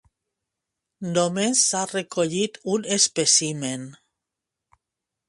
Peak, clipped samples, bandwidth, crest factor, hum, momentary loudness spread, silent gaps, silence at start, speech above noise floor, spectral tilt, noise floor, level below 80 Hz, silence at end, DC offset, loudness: -4 dBFS; under 0.1%; 11.5 kHz; 22 dB; none; 12 LU; none; 1 s; 62 dB; -2.5 dB/octave; -85 dBFS; -68 dBFS; 1.35 s; under 0.1%; -21 LUFS